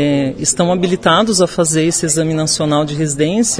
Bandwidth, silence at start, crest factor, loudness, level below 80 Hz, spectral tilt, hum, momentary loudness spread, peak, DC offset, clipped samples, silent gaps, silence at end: 11 kHz; 0 s; 14 dB; -14 LUFS; -44 dBFS; -4 dB/octave; none; 4 LU; 0 dBFS; 0.2%; under 0.1%; none; 0 s